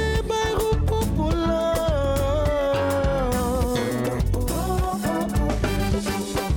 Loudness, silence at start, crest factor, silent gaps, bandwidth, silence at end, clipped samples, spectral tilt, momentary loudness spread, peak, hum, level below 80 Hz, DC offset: -23 LUFS; 0 s; 10 dB; none; 19 kHz; 0 s; under 0.1%; -6 dB/octave; 2 LU; -12 dBFS; none; -28 dBFS; under 0.1%